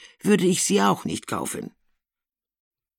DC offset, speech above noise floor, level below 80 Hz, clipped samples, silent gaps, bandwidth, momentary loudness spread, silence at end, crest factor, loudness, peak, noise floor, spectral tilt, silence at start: under 0.1%; over 68 dB; -64 dBFS; under 0.1%; none; 17 kHz; 13 LU; 1.3 s; 20 dB; -22 LUFS; -6 dBFS; under -90 dBFS; -4 dB/octave; 0 s